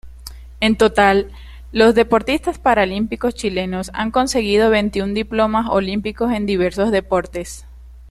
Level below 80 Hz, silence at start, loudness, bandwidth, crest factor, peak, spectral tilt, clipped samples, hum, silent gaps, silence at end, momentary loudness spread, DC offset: -36 dBFS; 0.05 s; -17 LUFS; 13.5 kHz; 16 dB; -2 dBFS; -5 dB/octave; under 0.1%; none; none; 0.05 s; 14 LU; under 0.1%